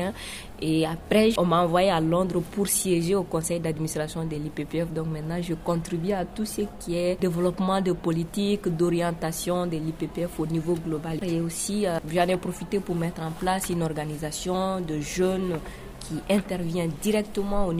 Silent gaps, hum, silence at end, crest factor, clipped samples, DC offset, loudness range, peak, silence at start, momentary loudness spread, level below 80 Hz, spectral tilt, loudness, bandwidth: none; none; 0 s; 18 dB; under 0.1%; under 0.1%; 5 LU; -8 dBFS; 0 s; 8 LU; -44 dBFS; -5.5 dB/octave; -27 LUFS; 16 kHz